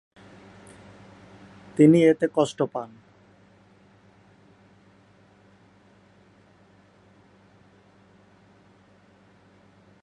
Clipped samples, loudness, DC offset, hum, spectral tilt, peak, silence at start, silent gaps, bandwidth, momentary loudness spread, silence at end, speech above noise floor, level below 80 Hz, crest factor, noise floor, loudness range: under 0.1%; -21 LUFS; under 0.1%; none; -7 dB/octave; -4 dBFS; 1.8 s; none; 11 kHz; 32 LU; 7.15 s; 37 dB; -70 dBFS; 24 dB; -57 dBFS; 11 LU